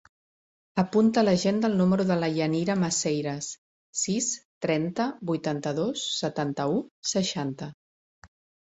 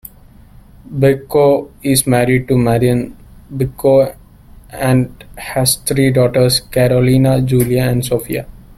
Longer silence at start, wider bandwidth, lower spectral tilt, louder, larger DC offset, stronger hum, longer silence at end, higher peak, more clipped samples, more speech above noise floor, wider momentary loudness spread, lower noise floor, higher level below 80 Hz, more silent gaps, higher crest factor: second, 0.75 s vs 0.9 s; second, 8.2 kHz vs 16 kHz; about the same, -4.5 dB/octave vs -5.5 dB/octave; second, -27 LUFS vs -14 LUFS; neither; neither; first, 0.4 s vs 0.2 s; second, -8 dBFS vs 0 dBFS; neither; first, over 64 dB vs 28 dB; about the same, 10 LU vs 11 LU; first, under -90 dBFS vs -41 dBFS; second, -64 dBFS vs -38 dBFS; first, 3.58-3.93 s, 4.45-4.61 s, 6.91-7.03 s, 7.74-8.22 s vs none; about the same, 18 dB vs 14 dB